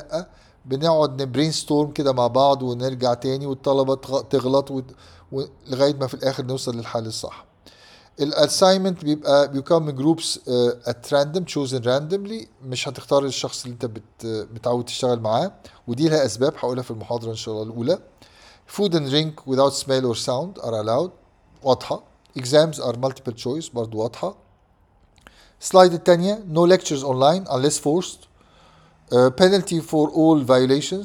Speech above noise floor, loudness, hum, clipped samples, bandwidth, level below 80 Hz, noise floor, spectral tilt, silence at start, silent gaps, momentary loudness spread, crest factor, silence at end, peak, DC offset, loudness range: 37 dB; -21 LUFS; none; under 0.1%; 16.5 kHz; -58 dBFS; -58 dBFS; -5 dB/octave; 0 s; none; 14 LU; 22 dB; 0 s; 0 dBFS; under 0.1%; 6 LU